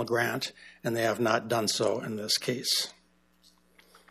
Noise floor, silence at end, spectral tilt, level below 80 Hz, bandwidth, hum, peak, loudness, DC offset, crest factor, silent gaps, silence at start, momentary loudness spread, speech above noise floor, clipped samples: -65 dBFS; 1.2 s; -3 dB/octave; -74 dBFS; 15 kHz; none; -10 dBFS; -29 LUFS; under 0.1%; 20 dB; none; 0 s; 8 LU; 36 dB; under 0.1%